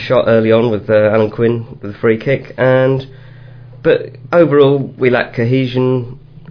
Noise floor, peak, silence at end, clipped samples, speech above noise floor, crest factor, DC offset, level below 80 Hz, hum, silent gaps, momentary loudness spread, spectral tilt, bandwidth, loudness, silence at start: -35 dBFS; 0 dBFS; 0.05 s; under 0.1%; 22 dB; 14 dB; under 0.1%; -44 dBFS; none; none; 9 LU; -9 dB/octave; 5.4 kHz; -13 LUFS; 0 s